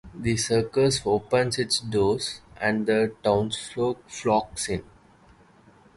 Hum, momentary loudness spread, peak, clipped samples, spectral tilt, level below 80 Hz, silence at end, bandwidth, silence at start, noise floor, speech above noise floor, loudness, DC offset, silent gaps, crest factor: none; 7 LU; -8 dBFS; under 0.1%; -4.5 dB/octave; -50 dBFS; 1.15 s; 11.5 kHz; 0.05 s; -55 dBFS; 31 dB; -25 LUFS; under 0.1%; none; 18 dB